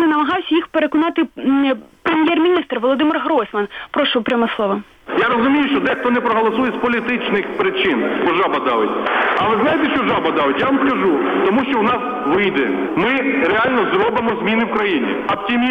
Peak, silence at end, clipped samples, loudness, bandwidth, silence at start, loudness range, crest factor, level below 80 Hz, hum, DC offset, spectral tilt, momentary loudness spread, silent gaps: -6 dBFS; 0 s; under 0.1%; -17 LUFS; 6.2 kHz; 0 s; 1 LU; 12 dB; -52 dBFS; none; under 0.1%; -6.5 dB/octave; 4 LU; none